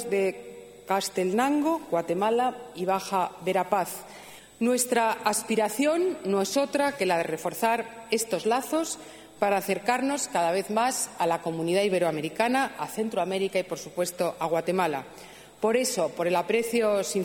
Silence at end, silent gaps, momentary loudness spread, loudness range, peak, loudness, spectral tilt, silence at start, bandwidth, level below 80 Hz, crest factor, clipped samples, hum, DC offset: 0 s; none; 7 LU; 2 LU; -10 dBFS; -27 LUFS; -3.5 dB/octave; 0 s; 17 kHz; -68 dBFS; 18 dB; under 0.1%; 50 Hz at -65 dBFS; under 0.1%